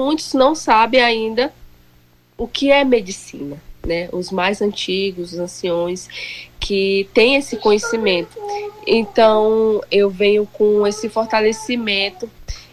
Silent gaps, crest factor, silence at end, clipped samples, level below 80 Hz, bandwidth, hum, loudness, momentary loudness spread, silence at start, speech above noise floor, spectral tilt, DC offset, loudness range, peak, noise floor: none; 14 dB; 0.1 s; under 0.1%; -44 dBFS; 13.5 kHz; 60 Hz at -50 dBFS; -17 LUFS; 15 LU; 0 s; 35 dB; -4 dB/octave; under 0.1%; 5 LU; -2 dBFS; -52 dBFS